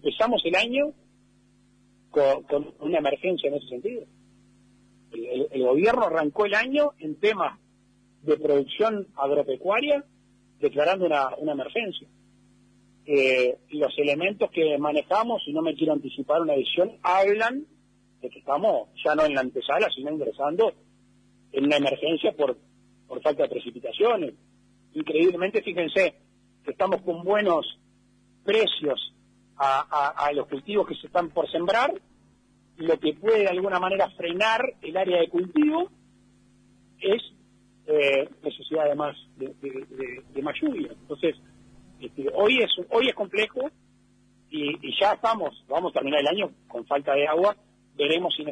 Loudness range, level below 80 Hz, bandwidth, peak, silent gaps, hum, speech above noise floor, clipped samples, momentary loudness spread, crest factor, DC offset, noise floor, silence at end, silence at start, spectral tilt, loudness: 3 LU; -66 dBFS; 10 kHz; -10 dBFS; none; 50 Hz at -65 dBFS; 36 dB; under 0.1%; 12 LU; 16 dB; under 0.1%; -61 dBFS; 0 s; 0.05 s; -5 dB/octave; -25 LUFS